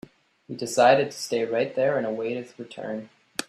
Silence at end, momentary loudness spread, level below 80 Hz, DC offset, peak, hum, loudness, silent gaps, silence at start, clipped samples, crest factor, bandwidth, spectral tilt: 0.05 s; 18 LU; -70 dBFS; under 0.1%; -6 dBFS; none; -25 LUFS; none; 0.5 s; under 0.1%; 20 dB; 14.5 kHz; -4 dB/octave